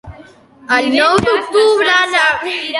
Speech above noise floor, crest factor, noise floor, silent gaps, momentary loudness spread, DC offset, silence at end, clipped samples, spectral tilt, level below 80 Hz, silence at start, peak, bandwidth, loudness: 28 dB; 14 dB; -41 dBFS; none; 5 LU; under 0.1%; 0 s; under 0.1%; -3.5 dB/octave; -46 dBFS; 0.05 s; 0 dBFS; 11.5 kHz; -12 LUFS